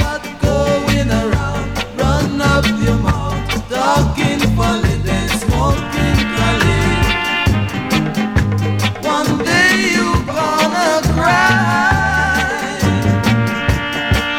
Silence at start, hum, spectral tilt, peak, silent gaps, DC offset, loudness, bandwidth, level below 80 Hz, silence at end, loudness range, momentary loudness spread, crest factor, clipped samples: 0 s; none; -5 dB/octave; -2 dBFS; none; under 0.1%; -15 LUFS; 17 kHz; -24 dBFS; 0 s; 3 LU; 5 LU; 12 dB; under 0.1%